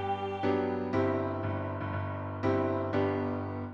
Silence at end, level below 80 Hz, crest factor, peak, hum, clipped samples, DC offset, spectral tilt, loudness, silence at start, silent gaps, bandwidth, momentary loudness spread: 0 s; -64 dBFS; 14 dB; -16 dBFS; none; under 0.1%; under 0.1%; -9 dB/octave; -32 LUFS; 0 s; none; 6.6 kHz; 5 LU